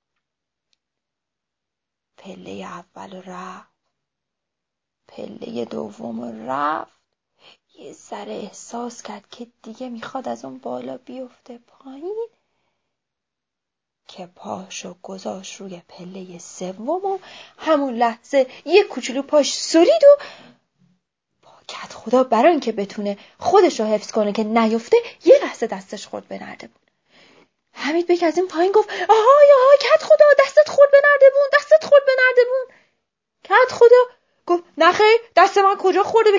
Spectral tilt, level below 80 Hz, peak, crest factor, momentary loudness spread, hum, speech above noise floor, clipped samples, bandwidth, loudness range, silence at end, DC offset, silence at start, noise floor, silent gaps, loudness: -3.5 dB/octave; -70 dBFS; 0 dBFS; 18 dB; 24 LU; none; 67 dB; under 0.1%; 7.8 kHz; 23 LU; 0 s; under 0.1%; 2.25 s; -84 dBFS; none; -16 LUFS